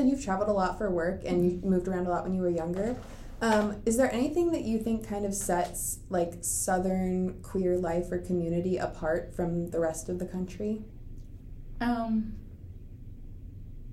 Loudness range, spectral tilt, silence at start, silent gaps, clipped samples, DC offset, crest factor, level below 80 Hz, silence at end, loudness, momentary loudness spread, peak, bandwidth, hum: 6 LU; -5.5 dB/octave; 0 s; none; under 0.1%; under 0.1%; 18 dB; -46 dBFS; 0 s; -30 LUFS; 20 LU; -12 dBFS; 15.5 kHz; none